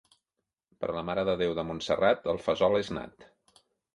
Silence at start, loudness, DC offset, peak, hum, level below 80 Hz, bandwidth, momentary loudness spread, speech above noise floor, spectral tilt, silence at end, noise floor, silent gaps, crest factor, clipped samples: 0.8 s; -29 LUFS; under 0.1%; -12 dBFS; none; -58 dBFS; 11.5 kHz; 11 LU; 57 dB; -5.5 dB/octave; 0.7 s; -86 dBFS; none; 20 dB; under 0.1%